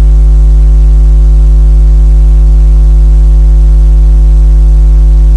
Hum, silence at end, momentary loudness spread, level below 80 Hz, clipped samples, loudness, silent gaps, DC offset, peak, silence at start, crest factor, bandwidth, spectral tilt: none; 0 s; 0 LU; -2 dBFS; 0.3%; -7 LUFS; none; under 0.1%; 0 dBFS; 0 s; 2 dB; 1.4 kHz; -9 dB/octave